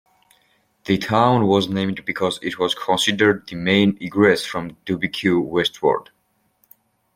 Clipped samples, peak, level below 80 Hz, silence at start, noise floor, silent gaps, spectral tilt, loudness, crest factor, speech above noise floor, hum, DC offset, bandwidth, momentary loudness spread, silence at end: under 0.1%; -2 dBFS; -56 dBFS; 0.85 s; -64 dBFS; none; -5 dB/octave; -19 LUFS; 20 dB; 45 dB; none; under 0.1%; 16 kHz; 8 LU; 1.15 s